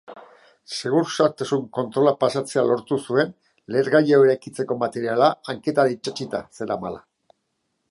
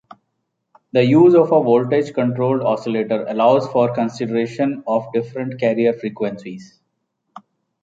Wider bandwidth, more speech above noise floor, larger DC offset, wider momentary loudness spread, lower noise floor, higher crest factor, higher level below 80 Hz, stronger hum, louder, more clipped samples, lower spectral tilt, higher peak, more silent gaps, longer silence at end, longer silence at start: first, 11.5 kHz vs 7.8 kHz; second, 53 dB vs 57 dB; neither; about the same, 12 LU vs 12 LU; about the same, -74 dBFS vs -74 dBFS; about the same, 20 dB vs 16 dB; about the same, -66 dBFS vs -64 dBFS; neither; second, -22 LUFS vs -17 LUFS; neither; second, -5.5 dB/octave vs -8 dB/octave; about the same, -2 dBFS vs -2 dBFS; neither; first, 0.95 s vs 0.45 s; second, 0.1 s vs 0.95 s